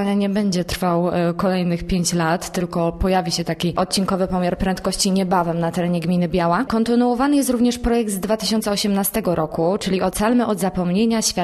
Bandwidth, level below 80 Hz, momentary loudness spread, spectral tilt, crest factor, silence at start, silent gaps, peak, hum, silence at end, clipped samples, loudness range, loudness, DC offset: 13.5 kHz; -38 dBFS; 4 LU; -5 dB/octave; 16 dB; 0 s; none; -4 dBFS; none; 0 s; under 0.1%; 2 LU; -20 LUFS; under 0.1%